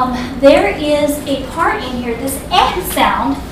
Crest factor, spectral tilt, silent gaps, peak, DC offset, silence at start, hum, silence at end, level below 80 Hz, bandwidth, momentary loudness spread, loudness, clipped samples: 14 dB; -4 dB/octave; none; 0 dBFS; 0.1%; 0 s; none; 0 s; -32 dBFS; 16.5 kHz; 10 LU; -14 LUFS; 0.4%